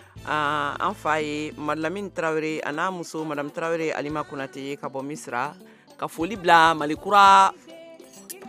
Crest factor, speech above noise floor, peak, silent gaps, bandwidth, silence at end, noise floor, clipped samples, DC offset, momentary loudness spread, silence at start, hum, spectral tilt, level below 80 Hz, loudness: 22 dB; 22 dB; -2 dBFS; none; 15.5 kHz; 0 s; -45 dBFS; under 0.1%; under 0.1%; 16 LU; 0.15 s; none; -4 dB/octave; -58 dBFS; -23 LUFS